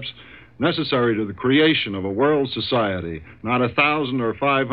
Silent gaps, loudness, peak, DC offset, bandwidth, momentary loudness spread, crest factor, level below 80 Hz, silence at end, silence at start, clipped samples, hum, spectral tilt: none; -20 LUFS; -4 dBFS; 0.2%; 5.2 kHz; 8 LU; 16 dB; -52 dBFS; 0 s; 0 s; under 0.1%; none; -9 dB/octave